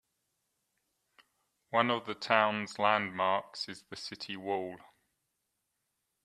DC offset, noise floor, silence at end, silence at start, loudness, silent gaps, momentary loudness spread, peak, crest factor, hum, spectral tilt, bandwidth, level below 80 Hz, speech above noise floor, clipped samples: under 0.1%; -83 dBFS; 1.45 s; 1.7 s; -32 LUFS; none; 14 LU; -10 dBFS; 26 dB; none; -4 dB/octave; 13 kHz; -80 dBFS; 51 dB; under 0.1%